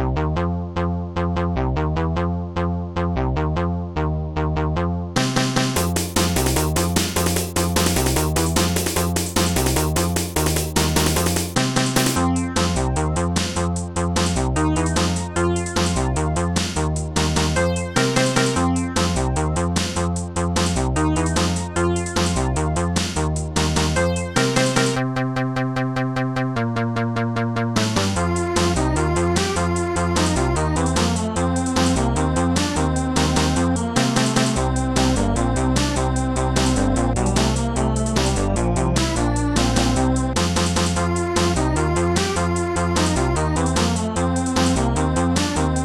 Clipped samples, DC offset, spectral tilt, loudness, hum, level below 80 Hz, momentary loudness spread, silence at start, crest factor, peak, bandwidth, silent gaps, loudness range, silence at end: under 0.1%; 0.4%; -4.5 dB/octave; -20 LUFS; none; -30 dBFS; 4 LU; 0 s; 16 dB; -4 dBFS; 19 kHz; none; 2 LU; 0 s